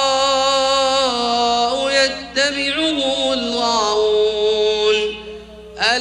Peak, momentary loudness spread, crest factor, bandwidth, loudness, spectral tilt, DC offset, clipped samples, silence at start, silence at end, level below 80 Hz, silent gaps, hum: -4 dBFS; 4 LU; 14 dB; 10.5 kHz; -17 LUFS; -1.5 dB/octave; under 0.1%; under 0.1%; 0 s; 0 s; -48 dBFS; none; none